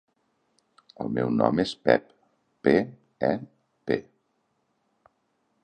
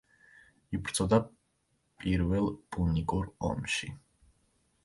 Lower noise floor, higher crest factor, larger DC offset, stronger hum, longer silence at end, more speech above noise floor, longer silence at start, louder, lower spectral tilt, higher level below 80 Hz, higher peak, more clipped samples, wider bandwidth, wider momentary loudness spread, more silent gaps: about the same, -73 dBFS vs -75 dBFS; about the same, 24 dB vs 22 dB; neither; neither; first, 1.6 s vs 0.85 s; first, 49 dB vs 45 dB; first, 1 s vs 0.7 s; first, -26 LUFS vs -32 LUFS; first, -7 dB/octave vs -5.5 dB/octave; second, -60 dBFS vs -46 dBFS; first, -4 dBFS vs -12 dBFS; neither; second, 9.2 kHz vs 11.5 kHz; about the same, 11 LU vs 12 LU; neither